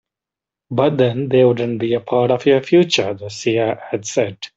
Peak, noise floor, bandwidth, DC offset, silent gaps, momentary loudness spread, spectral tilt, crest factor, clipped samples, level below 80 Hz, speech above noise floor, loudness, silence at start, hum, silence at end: -2 dBFS; -87 dBFS; 8 kHz; under 0.1%; none; 8 LU; -5.5 dB/octave; 14 dB; under 0.1%; -58 dBFS; 70 dB; -17 LUFS; 0.7 s; none; 0.1 s